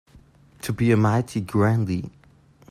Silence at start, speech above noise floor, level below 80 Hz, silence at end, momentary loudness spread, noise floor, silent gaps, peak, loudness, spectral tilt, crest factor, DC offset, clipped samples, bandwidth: 0.65 s; 33 dB; -54 dBFS; 0.6 s; 13 LU; -54 dBFS; none; -8 dBFS; -22 LUFS; -7.5 dB/octave; 16 dB; under 0.1%; under 0.1%; 14.5 kHz